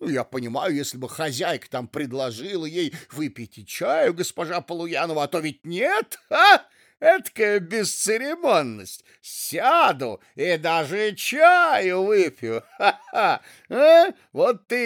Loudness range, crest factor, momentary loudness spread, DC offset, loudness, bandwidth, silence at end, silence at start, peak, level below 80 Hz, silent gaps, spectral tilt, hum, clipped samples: 7 LU; 20 dB; 16 LU; under 0.1%; -21 LUFS; 20 kHz; 0 s; 0 s; -2 dBFS; -78 dBFS; none; -3.5 dB/octave; none; under 0.1%